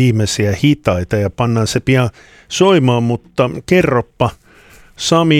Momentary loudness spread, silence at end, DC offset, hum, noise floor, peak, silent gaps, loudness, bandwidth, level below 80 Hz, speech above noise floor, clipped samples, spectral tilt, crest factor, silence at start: 7 LU; 0 s; under 0.1%; none; -43 dBFS; 0 dBFS; none; -15 LUFS; 15 kHz; -40 dBFS; 30 dB; under 0.1%; -5.5 dB/octave; 14 dB; 0 s